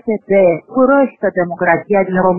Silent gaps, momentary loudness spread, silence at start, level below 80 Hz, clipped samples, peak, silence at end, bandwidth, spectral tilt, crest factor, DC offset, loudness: none; 4 LU; 0.05 s; -52 dBFS; under 0.1%; 0 dBFS; 0 s; 3.1 kHz; -11.5 dB/octave; 12 dB; under 0.1%; -13 LUFS